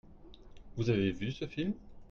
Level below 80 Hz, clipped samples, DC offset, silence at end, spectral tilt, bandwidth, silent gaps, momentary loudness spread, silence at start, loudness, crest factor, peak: -54 dBFS; under 0.1%; under 0.1%; 0.05 s; -7.5 dB/octave; 7 kHz; none; 12 LU; 0.05 s; -35 LUFS; 18 dB; -18 dBFS